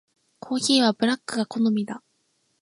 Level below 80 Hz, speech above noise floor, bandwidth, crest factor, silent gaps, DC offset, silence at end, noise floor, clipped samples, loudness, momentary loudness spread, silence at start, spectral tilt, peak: -74 dBFS; 47 dB; 11.5 kHz; 18 dB; none; under 0.1%; 0.65 s; -70 dBFS; under 0.1%; -23 LUFS; 12 LU; 0.45 s; -3.5 dB/octave; -6 dBFS